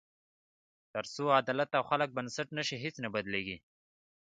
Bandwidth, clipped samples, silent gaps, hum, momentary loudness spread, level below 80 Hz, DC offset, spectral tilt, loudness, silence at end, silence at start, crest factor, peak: 9.4 kHz; under 0.1%; none; none; 12 LU; -72 dBFS; under 0.1%; -4.5 dB/octave; -34 LUFS; 0.7 s; 0.95 s; 24 dB; -12 dBFS